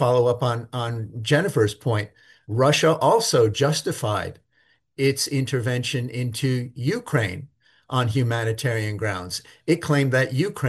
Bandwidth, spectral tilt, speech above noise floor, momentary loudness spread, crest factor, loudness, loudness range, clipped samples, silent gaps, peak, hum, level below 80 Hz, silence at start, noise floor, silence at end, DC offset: 12.5 kHz; -5 dB/octave; 42 dB; 11 LU; 16 dB; -23 LUFS; 4 LU; under 0.1%; none; -6 dBFS; none; -58 dBFS; 0 s; -64 dBFS; 0 s; under 0.1%